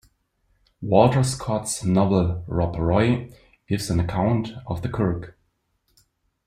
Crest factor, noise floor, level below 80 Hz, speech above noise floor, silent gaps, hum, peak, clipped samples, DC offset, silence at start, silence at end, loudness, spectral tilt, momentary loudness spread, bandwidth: 22 dB; -70 dBFS; -44 dBFS; 49 dB; none; none; -2 dBFS; under 0.1%; under 0.1%; 0.8 s; 1.15 s; -23 LUFS; -6.5 dB/octave; 12 LU; 14.5 kHz